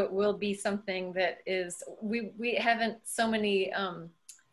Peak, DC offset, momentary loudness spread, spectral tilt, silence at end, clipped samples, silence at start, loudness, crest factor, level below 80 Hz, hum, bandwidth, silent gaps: -12 dBFS; under 0.1%; 9 LU; -4 dB/octave; 0.2 s; under 0.1%; 0 s; -31 LUFS; 20 dB; -70 dBFS; none; 13 kHz; none